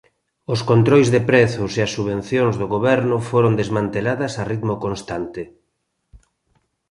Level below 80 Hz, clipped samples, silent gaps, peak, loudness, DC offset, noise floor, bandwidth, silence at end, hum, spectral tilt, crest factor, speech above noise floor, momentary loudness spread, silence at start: -48 dBFS; under 0.1%; none; -2 dBFS; -19 LUFS; under 0.1%; -72 dBFS; 11.5 kHz; 0.75 s; none; -6.5 dB/octave; 18 dB; 54 dB; 13 LU; 0.5 s